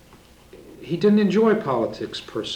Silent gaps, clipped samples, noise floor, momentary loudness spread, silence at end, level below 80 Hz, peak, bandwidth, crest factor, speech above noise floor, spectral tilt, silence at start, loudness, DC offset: none; under 0.1%; -50 dBFS; 14 LU; 0 s; -56 dBFS; -6 dBFS; 9.6 kHz; 16 dB; 29 dB; -6.5 dB/octave; 0.55 s; -21 LUFS; under 0.1%